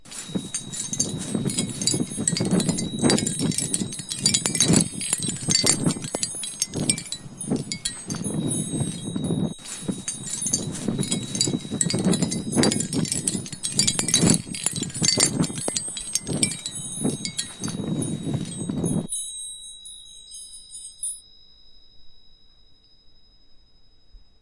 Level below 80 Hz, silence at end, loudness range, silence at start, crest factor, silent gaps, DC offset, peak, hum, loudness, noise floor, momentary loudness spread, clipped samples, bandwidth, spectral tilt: -54 dBFS; 0.15 s; 11 LU; 0.05 s; 26 dB; none; 0.1%; -2 dBFS; none; -24 LUFS; -54 dBFS; 12 LU; under 0.1%; 11.5 kHz; -3 dB/octave